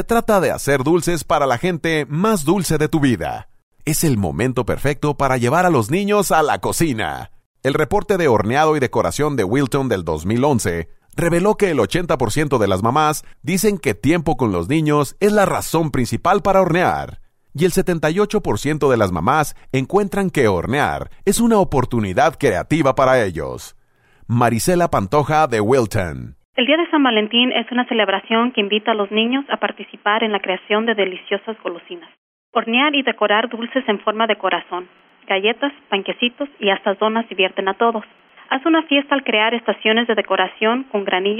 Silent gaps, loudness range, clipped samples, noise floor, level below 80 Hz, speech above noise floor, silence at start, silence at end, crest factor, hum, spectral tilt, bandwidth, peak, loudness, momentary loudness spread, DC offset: 3.63-3.72 s, 7.46-7.55 s, 26.45-26.53 s, 32.18-32.53 s; 3 LU; under 0.1%; -49 dBFS; -38 dBFS; 32 dB; 0 s; 0 s; 14 dB; none; -5 dB/octave; 16 kHz; -2 dBFS; -18 LUFS; 8 LU; under 0.1%